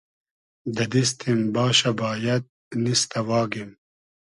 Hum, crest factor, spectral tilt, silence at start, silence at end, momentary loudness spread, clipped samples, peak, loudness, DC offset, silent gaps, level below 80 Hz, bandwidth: none; 18 dB; -4 dB/octave; 0.65 s; 0.65 s; 13 LU; under 0.1%; -6 dBFS; -23 LUFS; under 0.1%; 2.49-2.71 s; -62 dBFS; 11.5 kHz